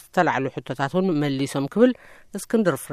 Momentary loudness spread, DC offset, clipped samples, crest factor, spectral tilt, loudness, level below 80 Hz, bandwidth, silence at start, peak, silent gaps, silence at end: 13 LU; under 0.1%; under 0.1%; 18 dB; -6 dB/octave; -23 LUFS; -62 dBFS; 15.5 kHz; 0.15 s; -4 dBFS; none; 0 s